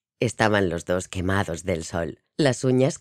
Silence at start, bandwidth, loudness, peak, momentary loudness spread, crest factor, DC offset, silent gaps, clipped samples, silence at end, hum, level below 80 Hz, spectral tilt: 0.2 s; 13.5 kHz; -24 LUFS; -2 dBFS; 8 LU; 20 dB; under 0.1%; none; under 0.1%; 0.05 s; none; -50 dBFS; -5.5 dB/octave